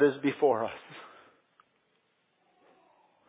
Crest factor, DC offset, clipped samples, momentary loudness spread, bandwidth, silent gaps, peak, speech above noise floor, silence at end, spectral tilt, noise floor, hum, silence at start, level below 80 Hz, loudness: 20 dB; under 0.1%; under 0.1%; 22 LU; 4 kHz; none; -12 dBFS; 45 dB; 2.25 s; -4.5 dB/octave; -73 dBFS; none; 0 s; -78 dBFS; -29 LUFS